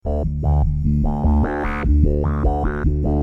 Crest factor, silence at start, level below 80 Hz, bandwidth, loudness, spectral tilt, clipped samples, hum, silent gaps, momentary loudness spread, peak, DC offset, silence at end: 14 dB; 0.05 s; -20 dBFS; 3.3 kHz; -20 LUFS; -10.5 dB/octave; under 0.1%; none; none; 4 LU; -4 dBFS; under 0.1%; 0 s